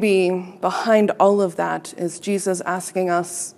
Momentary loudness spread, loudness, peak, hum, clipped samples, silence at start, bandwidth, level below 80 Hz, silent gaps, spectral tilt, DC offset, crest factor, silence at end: 8 LU; -20 LUFS; -2 dBFS; none; under 0.1%; 0 s; 14.5 kHz; -76 dBFS; none; -5 dB/octave; under 0.1%; 18 dB; 0.05 s